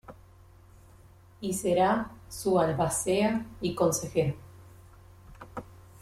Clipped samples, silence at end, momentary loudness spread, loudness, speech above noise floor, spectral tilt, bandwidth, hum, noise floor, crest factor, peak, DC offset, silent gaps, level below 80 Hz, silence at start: under 0.1%; 0.05 s; 18 LU; -28 LUFS; 27 dB; -5 dB/octave; 16 kHz; none; -54 dBFS; 18 dB; -12 dBFS; under 0.1%; none; -56 dBFS; 0.1 s